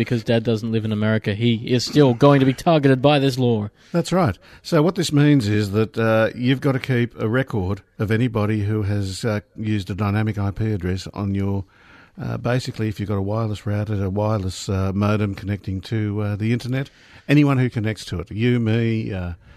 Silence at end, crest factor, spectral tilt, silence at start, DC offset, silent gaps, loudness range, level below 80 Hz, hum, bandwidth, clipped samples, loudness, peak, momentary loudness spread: 0.2 s; 18 dB; -7 dB/octave; 0 s; under 0.1%; none; 7 LU; -48 dBFS; none; 13.5 kHz; under 0.1%; -21 LUFS; -2 dBFS; 10 LU